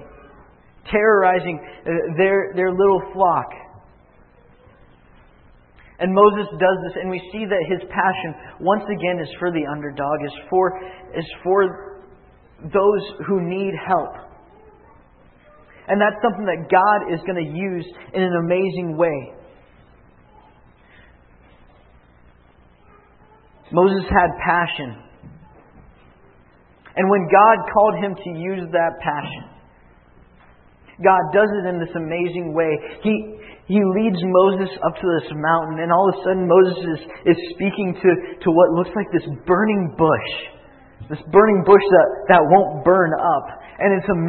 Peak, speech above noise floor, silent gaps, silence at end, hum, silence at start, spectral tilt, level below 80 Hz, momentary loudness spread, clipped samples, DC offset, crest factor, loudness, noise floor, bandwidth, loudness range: 0 dBFS; 34 dB; none; 0 s; none; 0 s; -11.5 dB/octave; -50 dBFS; 13 LU; under 0.1%; under 0.1%; 20 dB; -18 LUFS; -52 dBFS; 4.4 kHz; 7 LU